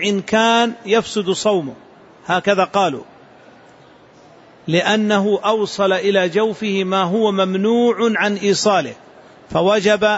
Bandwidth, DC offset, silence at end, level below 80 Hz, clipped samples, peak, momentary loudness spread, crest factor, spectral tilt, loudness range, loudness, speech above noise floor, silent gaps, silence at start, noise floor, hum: 8 kHz; under 0.1%; 0 s; -58 dBFS; under 0.1%; -4 dBFS; 6 LU; 14 dB; -4.5 dB/octave; 4 LU; -17 LUFS; 30 dB; none; 0 s; -46 dBFS; none